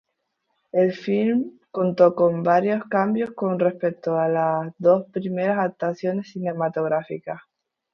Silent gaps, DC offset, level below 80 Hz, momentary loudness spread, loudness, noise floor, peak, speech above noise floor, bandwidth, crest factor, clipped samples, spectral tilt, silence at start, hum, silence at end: none; under 0.1%; -68 dBFS; 10 LU; -22 LUFS; -75 dBFS; -4 dBFS; 54 dB; 6.6 kHz; 20 dB; under 0.1%; -9 dB/octave; 0.75 s; none; 0.55 s